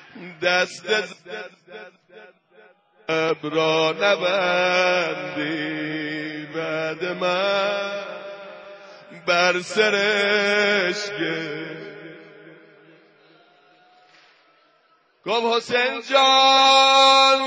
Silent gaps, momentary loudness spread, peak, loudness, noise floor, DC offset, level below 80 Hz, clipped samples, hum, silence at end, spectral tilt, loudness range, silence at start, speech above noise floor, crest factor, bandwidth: none; 23 LU; -4 dBFS; -19 LUFS; -61 dBFS; under 0.1%; -70 dBFS; under 0.1%; none; 0 s; -2.5 dB/octave; 9 LU; 0.15 s; 41 dB; 18 dB; 8 kHz